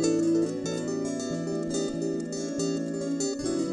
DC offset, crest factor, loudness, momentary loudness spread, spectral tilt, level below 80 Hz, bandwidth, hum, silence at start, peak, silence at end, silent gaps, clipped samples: under 0.1%; 14 dB; -29 LUFS; 6 LU; -5 dB/octave; -62 dBFS; 12 kHz; none; 0 s; -14 dBFS; 0 s; none; under 0.1%